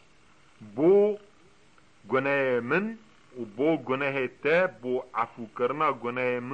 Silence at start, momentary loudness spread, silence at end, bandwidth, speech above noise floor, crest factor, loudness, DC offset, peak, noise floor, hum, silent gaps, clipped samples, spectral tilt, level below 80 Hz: 0.6 s; 16 LU; 0 s; 8.4 kHz; 34 dB; 16 dB; -27 LUFS; 0.1%; -12 dBFS; -60 dBFS; none; none; under 0.1%; -7.5 dB/octave; -70 dBFS